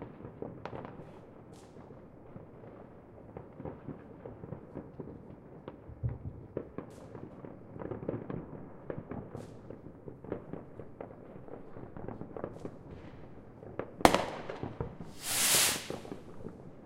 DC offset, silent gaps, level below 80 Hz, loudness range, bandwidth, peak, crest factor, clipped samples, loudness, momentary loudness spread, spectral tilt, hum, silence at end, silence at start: under 0.1%; none; -56 dBFS; 18 LU; 16 kHz; 0 dBFS; 38 dB; under 0.1%; -35 LUFS; 22 LU; -3 dB/octave; none; 0 s; 0 s